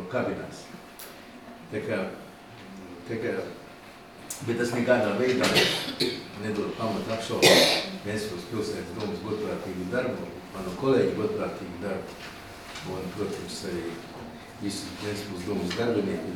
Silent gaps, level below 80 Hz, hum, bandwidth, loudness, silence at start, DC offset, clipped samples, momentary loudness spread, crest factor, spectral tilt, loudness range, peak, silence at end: none; -58 dBFS; none; 19.5 kHz; -28 LUFS; 0 s; under 0.1%; under 0.1%; 20 LU; 26 dB; -4 dB/octave; 12 LU; -4 dBFS; 0 s